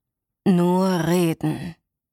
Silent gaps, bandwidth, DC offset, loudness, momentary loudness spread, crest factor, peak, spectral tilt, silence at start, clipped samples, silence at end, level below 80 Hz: none; 16 kHz; under 0.1%; -21 LUFS; 11 LU; 14 dB; -8 dBFS; -7 dB/octave; 0.45 s; under 0.1%; 0.4 s; -56 dBFS